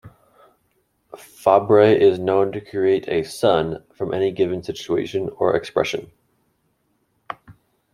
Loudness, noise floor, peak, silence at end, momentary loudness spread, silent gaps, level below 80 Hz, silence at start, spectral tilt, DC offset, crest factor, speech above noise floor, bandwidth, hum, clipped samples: -20 LUFS; -68 dBFS; -2 dBFS; 0.4 s; 15 LU; none; -58 dBFS; 0.05 s; -6 dB/octave; under 0.1%; 20 dB; 49 dB; 13 kHz; none; under 0.1%